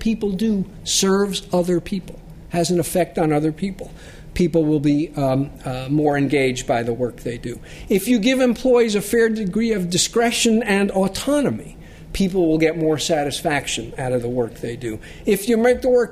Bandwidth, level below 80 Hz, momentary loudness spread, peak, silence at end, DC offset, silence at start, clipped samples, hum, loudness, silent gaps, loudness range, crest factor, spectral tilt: 15.5 kHz; -42 dBFS; 12 LU; -4 dBFS; 0 s; under 0.1%; 0 s; under 0.1%; none; -20 LUFS; none; 3 LU; 16 dB; -4.5 dB/octave